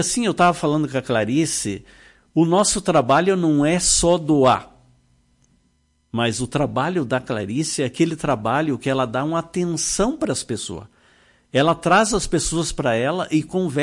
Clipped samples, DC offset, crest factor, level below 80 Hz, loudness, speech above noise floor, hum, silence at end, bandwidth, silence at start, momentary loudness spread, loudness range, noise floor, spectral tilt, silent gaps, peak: under 0.1%; under 0.1%; 16 dB; -42 dBFS; -20 LUFS; 44 dB; none; 0 s; 11.5 kHz; 0 s; 8 LU; 5 LU; -64 dBFS; -4.5 dB/octave; none; -6 dBFS